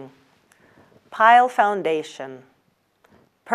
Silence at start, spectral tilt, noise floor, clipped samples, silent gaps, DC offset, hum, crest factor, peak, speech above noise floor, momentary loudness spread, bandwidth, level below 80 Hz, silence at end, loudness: 0 s; -4 dB/octave; -66 dBFS; under 0.1%; none; under 0.1%; none; 20 dB; -2 dBFS; 48 dB; 23 LU; 11 kHz; -78 dBFS; 0 s; -18 LUFS